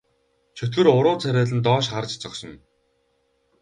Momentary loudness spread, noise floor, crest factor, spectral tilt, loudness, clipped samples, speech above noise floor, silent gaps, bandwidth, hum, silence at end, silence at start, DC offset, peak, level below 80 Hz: 17 LU; -68 dBFS; 20 dB; -6 dB/octave; -21 LUFS; under 0.1%; 47 dB; none; 10 kHz; none; 1.05 s; 0.55 s; under 0.1%; -2 dBFS; -60 dBFS